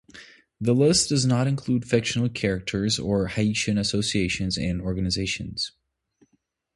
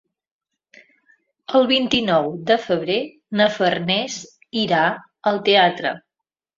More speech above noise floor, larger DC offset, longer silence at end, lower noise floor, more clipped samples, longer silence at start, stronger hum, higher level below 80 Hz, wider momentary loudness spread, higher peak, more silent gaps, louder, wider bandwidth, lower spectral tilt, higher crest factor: second, 47 dB vs 66 dB; neither; first, 1.05 s vs 0.6 s; second, -71 dBFS vs -85 dBFS; neither; second, 0.15 s vs 1.5 s; neither; first, -46 dBFS vs -60 dBFS; second, 8 LU vs 11 LU; second, -6 dBFS vs -2 dBFS; neither; second, -24 LUFS vs -19 LUFS; first, 11.5 kHz vs 7.8 kHz; about the same, -4.5 dB/octave vs -4.5 dB/octave; about the same, 18 dB vs 20 dB